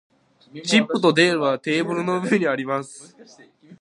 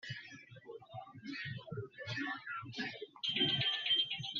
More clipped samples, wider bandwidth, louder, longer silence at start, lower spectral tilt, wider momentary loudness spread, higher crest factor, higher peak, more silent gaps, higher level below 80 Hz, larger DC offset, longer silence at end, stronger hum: neither; first, 11.5 kHz vs 7.2 kHz; first, -20 LUFS vs -37 LUFS; first, 0.55 s vs 0.05 s; first, -4.5 dB/octave vs -1 dB/octave; second, 11 LU vs 20 LU; about the same, 20 dB vs 20 dB; first, -2 dBFS vs -20 dBFS; neither; first, -72 dBFS vs -78 dBFS; neither; about the same, 0.05 s vs 0 s; neither